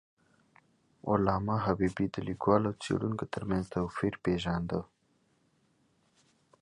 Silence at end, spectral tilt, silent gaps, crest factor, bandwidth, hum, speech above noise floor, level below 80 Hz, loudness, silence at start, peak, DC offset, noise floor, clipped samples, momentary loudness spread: 1.8 s; -7.5 dB/octave; none; 22 dB; 11 kHz; none; 41 dB; -54 dBFS; -32 LUFS; 1.05 s; -12 dBFS; under 0.1%; -72 dBFS; under 0.1%; 7 LU